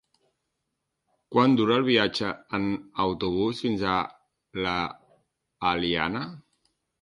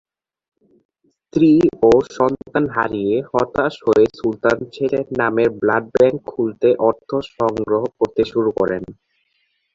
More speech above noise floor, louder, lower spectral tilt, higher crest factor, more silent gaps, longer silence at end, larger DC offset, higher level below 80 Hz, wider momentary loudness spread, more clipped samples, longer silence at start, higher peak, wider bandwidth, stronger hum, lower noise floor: first, 56 dB vs 49 dB; second, -26 LUFS vs -18 LUFS; about the same, -6 dB/octave vs -7 dB/octave; first, 22 dB vs 16 dB; neither; second, 0.6 s vs 0.8 s; neither; second, -56 dBFS vs -50 dBFS; first, 11 LU vs 7 LU; neither; about the same, 1.3 s vs 1.35 s; second, -6 dBFS vs -2 dBFS; first, 11.5 kHz vs 7.6 kHz; neither; first, -81 dBFS vs -67 dBFS